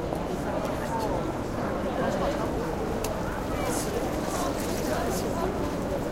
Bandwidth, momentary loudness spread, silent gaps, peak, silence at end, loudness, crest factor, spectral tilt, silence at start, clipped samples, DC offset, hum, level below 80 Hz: 17 kHz; 3 LU; none; -12 dBFS; 0 s; -29 LUFS; 16 dB; -5.5 dB/octave; 0 s; under 0.1%; under 0.1%; none; -40 dBFS